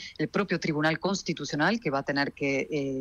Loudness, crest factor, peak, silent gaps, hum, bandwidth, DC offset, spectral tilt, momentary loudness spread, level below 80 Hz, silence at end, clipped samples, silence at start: -28 LUFS; 16 dB; -12 dBFS; none; none; 10 kHz; under 0.1%; -5 dB/octave; 4 LU; -62 dBFS; 0 s; under 0.1%; 0 s